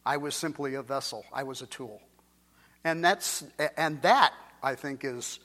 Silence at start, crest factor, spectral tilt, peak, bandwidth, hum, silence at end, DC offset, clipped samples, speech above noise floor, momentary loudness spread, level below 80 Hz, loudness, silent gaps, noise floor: 0.05 s; 26 dB; -3 dB/octave; -6 dBFS; 16.5 kHz; none; 0.1 s; under 0.1%; under 0.1%; 34 dB; 15 LU; -72 dBFS; -29 LUFS; none; -63 dBFS